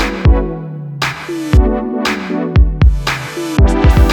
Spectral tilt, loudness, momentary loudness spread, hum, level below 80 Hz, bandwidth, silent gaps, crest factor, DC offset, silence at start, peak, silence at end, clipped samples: -6.5 dB/octave; -14 LUFS; 9 LU; none; -14 dBFS; 14.5 kHz; none; 12 dB; under 0.1%; 0 s; 0 dBFS; 0 s; under 0.1%